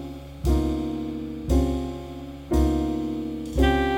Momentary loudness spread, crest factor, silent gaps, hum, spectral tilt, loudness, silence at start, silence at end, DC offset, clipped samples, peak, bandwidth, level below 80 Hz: 12 LU; 16 dB; none; none; -7 dB/octave; -26 LUFS; 0 s; 0 s; under 0.1%; under 0.1%; -8 dBFS; 16.5 kHz; -28 dBFS